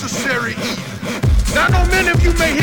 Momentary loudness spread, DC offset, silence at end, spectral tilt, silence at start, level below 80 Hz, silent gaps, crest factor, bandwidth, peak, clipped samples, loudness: 9 LU; under 0.1%; 0 s; -4.5 dB/octave; 0 s; -20 dBFS; none; 12 dB; 19 kHz; -2 dBFS; under 0.1%; -16 LUFS